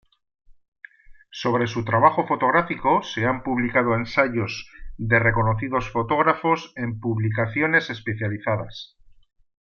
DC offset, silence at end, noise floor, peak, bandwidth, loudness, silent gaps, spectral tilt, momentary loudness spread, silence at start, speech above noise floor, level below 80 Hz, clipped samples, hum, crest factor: under 0.1%; 0.8 s; -48 dBFS; -2 dBFS; 7 kHz; -22 LUFS; 0.68-0.72 s; -7 dB/octave; 11 LU; 0.5 s; 25 dB; -46 dBFS; under 0.1%; none; 20 dB